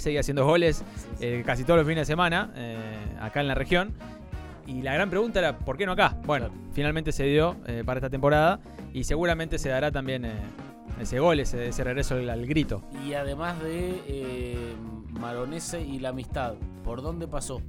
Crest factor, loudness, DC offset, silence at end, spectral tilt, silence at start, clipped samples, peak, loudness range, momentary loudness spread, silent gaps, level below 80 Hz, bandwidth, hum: 20 dB; -28 LUFS; under 0.1%; 0 s; -5.5 dB/octave; 0 s; under 0.1%; -6 dBFS; 7 LU; 14 LU; none; -38 dBFS; 16 kHz; none